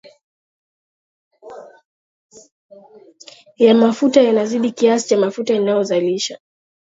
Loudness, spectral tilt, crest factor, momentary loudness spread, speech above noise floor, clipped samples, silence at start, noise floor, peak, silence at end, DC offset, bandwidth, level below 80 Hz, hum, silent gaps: -16 LUFS; -5 dB/octave; 18 dB; 10 LU; 29 dB; under 0.1%; 1.45 s; -44 dBFS; 0 dBFS; 0.5 s; under 0.1%; 8 kHz; -70 dBFS; none; 1.85-2.30 s, 2.52-2.69 s